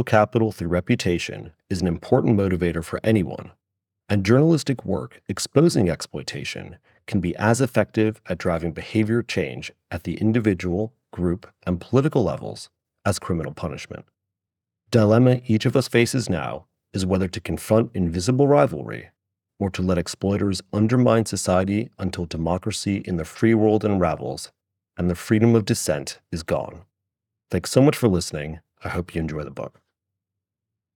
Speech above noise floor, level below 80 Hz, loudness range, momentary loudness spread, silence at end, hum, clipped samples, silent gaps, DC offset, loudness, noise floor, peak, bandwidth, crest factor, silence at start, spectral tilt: 65 dB; -52 dBFS; 3 LU; 14 LU; 1.25 s; none; under 0.1%; none; under 0.1%; -22 LUFS; -86 dBFS; -2 dBFS; 18.5 kHz; 20 dB; 0 s; -6 dB/octave